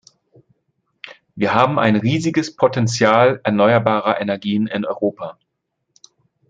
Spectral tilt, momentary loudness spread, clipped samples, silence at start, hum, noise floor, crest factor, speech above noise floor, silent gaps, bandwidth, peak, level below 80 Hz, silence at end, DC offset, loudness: -6 dB/octave; 15 LU; under 0.1%; 1.05 s; none; -75 dBFS; 18 dB; 58 dB; none; 9.2 kHz; 0 dBFS; -60 dBFS; 1.15 s; under 0.1%; -17 LUFS